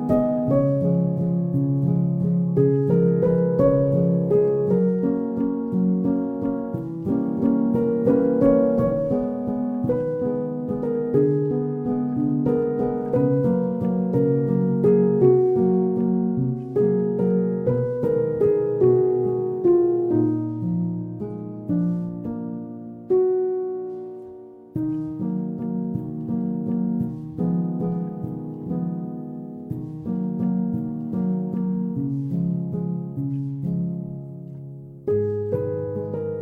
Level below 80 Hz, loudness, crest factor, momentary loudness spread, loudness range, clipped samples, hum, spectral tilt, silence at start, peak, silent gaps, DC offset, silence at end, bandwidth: -52 dBFS; -23 LUFS; 16 dB; 12 LU; 7 LU; under 0.1%; none; -12.5 dB/octave; 0 s; -6 dBFS; none; under 0.1%; 0 s; 2.7 kHz